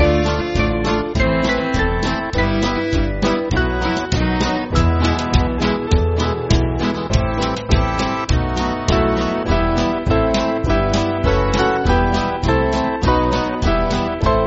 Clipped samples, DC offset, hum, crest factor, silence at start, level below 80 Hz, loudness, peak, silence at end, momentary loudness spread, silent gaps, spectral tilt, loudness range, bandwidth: under 0.1%; under 0.1%; none; 16 dB; 0 s; -24 dBFS; -18 LUFS; -2 dBFS; 0 s; 3 LU; none; -5 dB/octave; 1 LU; 8 kHz